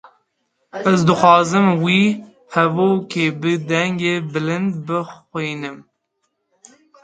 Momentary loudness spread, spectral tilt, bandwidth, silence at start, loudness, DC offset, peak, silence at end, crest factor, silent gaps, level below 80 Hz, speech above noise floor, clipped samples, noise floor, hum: 13 LU; -6 dB/octave; 9.2 kHz; 0.75 s; -17 LUFS; under 0.1%; 0 dBFS; 1.2 s; 18 dB; none; -60 dBFS; 55 dB; under 0.1%; -72 dBFS; none